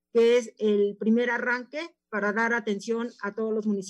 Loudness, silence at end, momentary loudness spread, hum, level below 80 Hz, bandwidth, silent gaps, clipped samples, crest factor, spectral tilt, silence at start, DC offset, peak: -26 LUFS; 0 s; 10 LU; none; -84 dBFS; 10 kHz; none; under 0.1%; 14 dB; -5.5 dB/octave; 0.15 s; under 0.1%; -12 dBFS